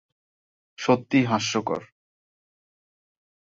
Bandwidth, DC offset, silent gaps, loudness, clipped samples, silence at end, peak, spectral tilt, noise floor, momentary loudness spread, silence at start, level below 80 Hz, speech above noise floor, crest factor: 7.8 kHz; under 0.1%; none; -24 LUFS; under 0.1%; 1.65 s; -8 dBFS; -5 dB/octave; under -90 dBFS; 10 LU; 0.8 s; -66 dBFS; over 67 dB; 20 dB